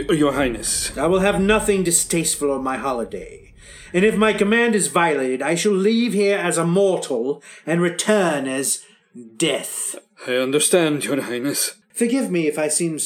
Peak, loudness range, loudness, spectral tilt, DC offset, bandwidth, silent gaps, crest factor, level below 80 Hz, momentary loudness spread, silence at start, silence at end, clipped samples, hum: -2 dBFS; 3 LU; -19 LUFS; -3.5 dB/octave; under 0.1%; 17.5 kHz; none; 18 dB; -46 dBFS; 8 LU; 0 s; 0 s; under 0.1%; none